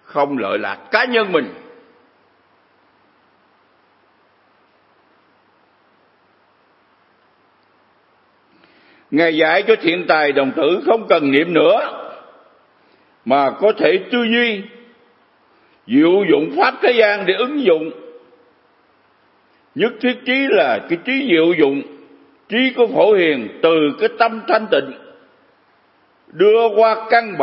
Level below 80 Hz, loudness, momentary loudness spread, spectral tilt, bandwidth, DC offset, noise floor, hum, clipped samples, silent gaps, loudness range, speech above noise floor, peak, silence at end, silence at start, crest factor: -76 dBFS; -15 LUFS; 9 LU; -8.5 dB/octave; 5.8 kHz; under 0.1%; -57 dBFS; none; under 0.1%; none; 5 LU; 41 dB; 0 dBFS; 0 s; 0.1 s; 18 dB